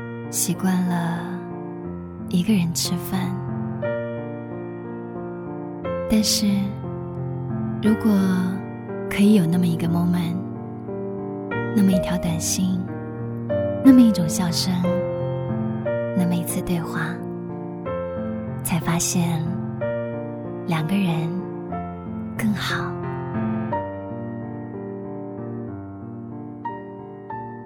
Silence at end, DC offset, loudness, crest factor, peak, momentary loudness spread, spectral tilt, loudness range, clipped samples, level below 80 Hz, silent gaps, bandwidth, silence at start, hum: 0 s; under 0.1%; -24 LUFS; 22 dB; -2 dBFS; 14 LU; -5.5 dB/octave; 8 LU; under 0.1%; -50 dBFS; none; 17 kHz; 0 s; none